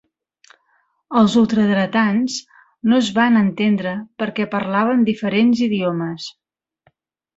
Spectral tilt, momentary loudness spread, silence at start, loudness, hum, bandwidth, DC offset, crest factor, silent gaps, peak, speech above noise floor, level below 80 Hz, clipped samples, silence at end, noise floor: -6 dB/octave; 10 LU; 1.1 s; -18 LUFS; none; 8 kHz; under 0.1%; 16 dB; none; -2 dBFS; 47 dB; -60 dBFS; under 0.1%; 1.05 s; -64 dBFS